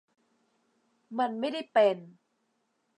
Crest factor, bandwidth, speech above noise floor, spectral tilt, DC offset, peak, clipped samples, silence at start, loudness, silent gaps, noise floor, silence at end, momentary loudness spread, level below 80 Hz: 20 dB; 10 kHz; 48 dB; -5.5 dB/octave; under 0.1%; -12 dBFS; under 0.1%; 1.1 s; -28 LUFS; none; -76 dBFS; 0.9 s; 14 LU; under -90 dBFS